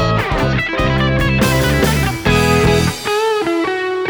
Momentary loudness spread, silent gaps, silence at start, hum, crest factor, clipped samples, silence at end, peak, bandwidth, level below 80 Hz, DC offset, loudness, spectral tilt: 4 LU; none; 0 s; none; 14 dB; under 0.1%; 0 s; 0 dBFS; over 20 kHz; -26 dBFS; under 0.1%; -15 LUFS; -5.5 dB/octave